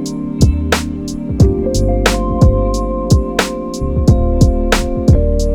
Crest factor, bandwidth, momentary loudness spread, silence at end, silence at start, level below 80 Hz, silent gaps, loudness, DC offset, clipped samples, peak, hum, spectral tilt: 12 dB; 18.5 kHz; 7 LU; 0 s; 0 s; -16 dBFS; none; -14 LUFS; under 0.1%; 0.3%; 0 dBFS; none; -6 dB/octave